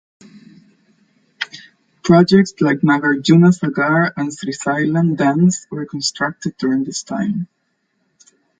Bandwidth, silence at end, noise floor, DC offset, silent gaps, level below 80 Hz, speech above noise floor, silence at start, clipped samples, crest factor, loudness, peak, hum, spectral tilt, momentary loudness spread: 9.4 kHz; 1.15 s; -67 dBFS; under 0.1%; none; -56 dBFS; 52 dB; 1.4 s; under 0.1%; 16 dB; -16 LUFS; 0 dBFS; none; -6 dB/octave; 15 LU